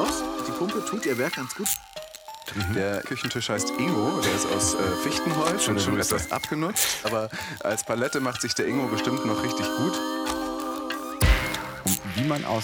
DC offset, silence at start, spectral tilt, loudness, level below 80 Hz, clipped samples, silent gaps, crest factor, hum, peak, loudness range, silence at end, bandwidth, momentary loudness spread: under 0.1%; 0 s; -3.5 dB/octave; -26 LUFS; -38 dBFS; under 0.1%; none; 20 dB; none; -6 dBFS; 3 LU; 0 s; 19.5 kHz; 7 LU